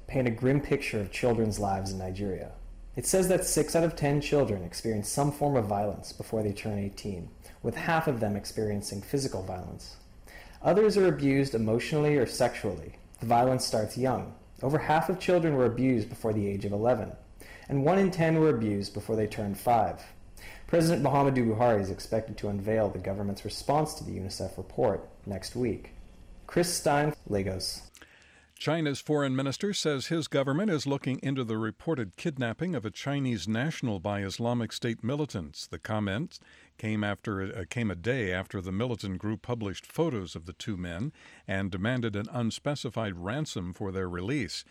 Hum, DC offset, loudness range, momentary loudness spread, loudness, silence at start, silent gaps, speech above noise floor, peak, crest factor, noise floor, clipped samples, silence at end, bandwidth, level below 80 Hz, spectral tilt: none; under 0.1%; 6 LU; 12 LU; -30 LUFS; 0 s; none; 29 dB; -16 dBFS; 14 dB; -58 dBFS; under 0.1%; 0.1 s; 16 kHz; -52 dBFS; -5.5 dB/octave